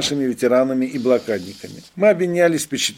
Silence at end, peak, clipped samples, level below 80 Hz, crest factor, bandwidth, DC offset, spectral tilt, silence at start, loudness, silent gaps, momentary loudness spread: 0.05 s; -4 dBFS; under 0.1%; -62 dBFS; 16 dB; 16.5 kHz; under 0.1%; -4 dB/octave; 0 s; -18 LUFS; none; 14 LU